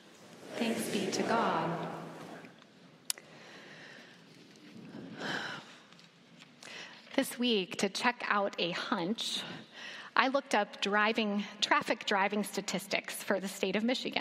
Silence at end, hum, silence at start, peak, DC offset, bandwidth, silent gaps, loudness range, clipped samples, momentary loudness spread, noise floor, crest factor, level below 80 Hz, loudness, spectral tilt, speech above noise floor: 0 s; none; 0.05 s; -8 dBFS; under 0.1%; 16 kHz; none; 14 LU; under 0.1%; 20 LU; -58 dBFS; 28 dB; -86 dBFS; -33 LUFS; -3.5 dB/octave; 26 dB